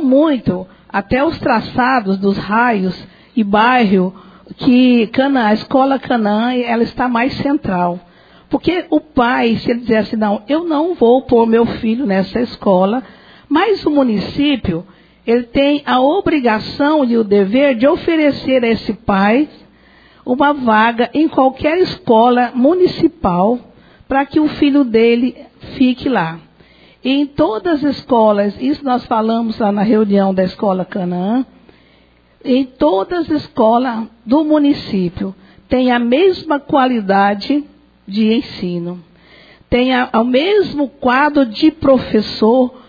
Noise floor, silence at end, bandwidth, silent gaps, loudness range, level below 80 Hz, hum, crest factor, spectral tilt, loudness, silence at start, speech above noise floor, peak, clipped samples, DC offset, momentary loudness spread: -50 dBFS; 0.1 s; 5 kHz; none; 3 LU; -44 dBFS; none; 14 dB; -8 dB/octave; -14 LUFS; 0 s; 37 dB; 0 dBFS; under 0.1%; under 0.1%; 8 LU